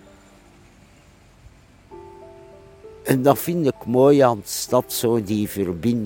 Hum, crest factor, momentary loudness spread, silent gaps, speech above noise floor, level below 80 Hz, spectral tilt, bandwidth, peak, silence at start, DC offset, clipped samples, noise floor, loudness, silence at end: none; 22 dB; 10 LU; none; 32 dB; -54 dBFS; -5.5 dB/octave; 17 kHz; 0 dBFS; 1.9 s; under 0.1%; under 0.1%; -51 dBFS; -20 LUFS; 0 s